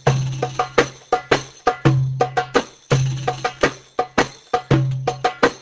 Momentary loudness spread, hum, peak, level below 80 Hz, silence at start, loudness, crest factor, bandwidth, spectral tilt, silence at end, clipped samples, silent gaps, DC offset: 5 LU; none; 0 dBFS; -44 dBFS; 0.05 s; -21 LUFS; 20 dB; 8 kHz; -5.5 dB/octave; 0.05 s; under 0.1%; none; under 0.1%